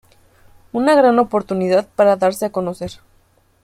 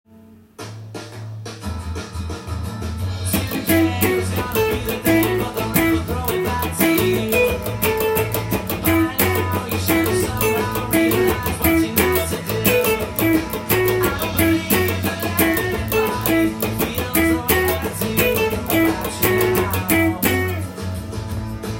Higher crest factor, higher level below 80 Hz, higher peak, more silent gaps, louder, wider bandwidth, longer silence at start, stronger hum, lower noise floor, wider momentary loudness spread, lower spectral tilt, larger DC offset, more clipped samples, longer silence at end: about the same, 16 dB vs 18 dB; second, -54 dBFS vs -38 dBFS; about the same, -2 dBFS vs -2 dBFS; neither; first, -16 LUFS vs -19 LUFS; second, 15 kHz vs 17 kHz; first, 0.75 s vs 0.3 s; neither; first, -56 dBFS vs -46 dBFS; first, 14 LU vs 11 LU; about the same, -6 dB/octave vs -5 dB/octave; neither; neither; first, 0.7 s vs 0 s